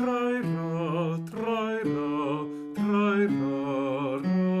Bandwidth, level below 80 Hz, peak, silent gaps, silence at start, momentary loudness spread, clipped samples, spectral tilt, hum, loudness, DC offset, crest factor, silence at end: 12 kHz; -68 dBFS; -14 dBFS; none; 0 s; 6 LU; under 0.1%; -8 dB/octave; none; -28 LUFS; under 0.1%; 12 dB; 0 s